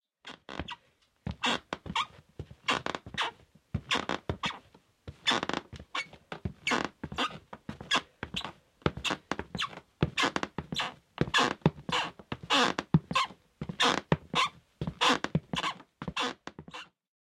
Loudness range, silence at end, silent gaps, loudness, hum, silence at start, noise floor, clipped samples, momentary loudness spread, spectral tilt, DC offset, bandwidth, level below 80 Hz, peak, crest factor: 6 LU; 0.4 s; none; -32 LUFS; none; 0.25 s; -68 dBFS; under 0.1%; 18 LU; -4 dB/octave; under 0.1%; 14.5 kHz; -56 dBFS; -6 dBFS; 26 dB